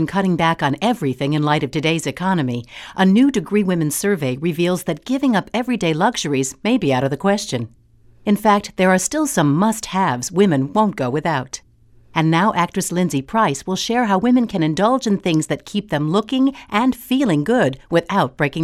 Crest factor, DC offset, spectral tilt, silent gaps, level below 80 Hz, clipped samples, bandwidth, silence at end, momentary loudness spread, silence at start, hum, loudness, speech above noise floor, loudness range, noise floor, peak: 16 dB; under 0.1%; -5.5 dB/octave; none; -50 dBFS; under 0.1%; 15.5 kHz; 0 s; 6 LU; 0 s; none; -18 LUFS; 31 dB; 2 LU; -49 dBFS; -2 dBFS